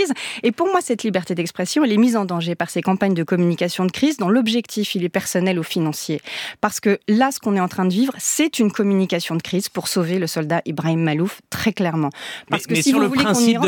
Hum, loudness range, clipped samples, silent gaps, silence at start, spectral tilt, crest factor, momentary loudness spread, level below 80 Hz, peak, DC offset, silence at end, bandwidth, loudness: none; 2 LU; under 0.1%; none; 0 s; -5 dB/octave; 18 dB; 6 LU; -60 dBFS; -2 dBFS; under 0.1%; 0 s; 19 kHz; -20 LUFS